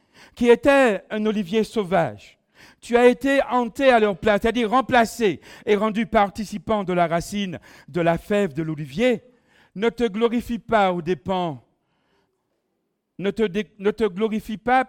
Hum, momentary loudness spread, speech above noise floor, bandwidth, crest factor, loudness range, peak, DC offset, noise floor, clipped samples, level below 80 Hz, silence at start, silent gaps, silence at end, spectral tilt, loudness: none; 11 LU; 54 dB; 16.5 kHz; 20 dB; 6 LU; -2 dBFS; under 0.1%; -75 dBFS; under 0.1%; -50 dBFS; 0.35 s; none; 0.05 s; -5.5 dB/octave; -21 LUFS